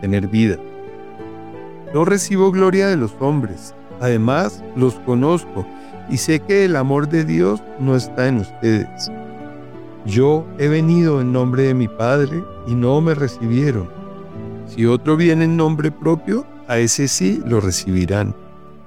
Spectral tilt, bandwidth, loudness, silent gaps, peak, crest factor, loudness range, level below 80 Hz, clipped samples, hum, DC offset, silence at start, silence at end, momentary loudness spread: -6 dB/octave; 15.5 kHz; -17 LUFS; none; -4 dBFS; 14 dB; 3 LU; -50 dBFS; under 0.1%; none; 0.9%; 0 s; 0.4 s; 19 LU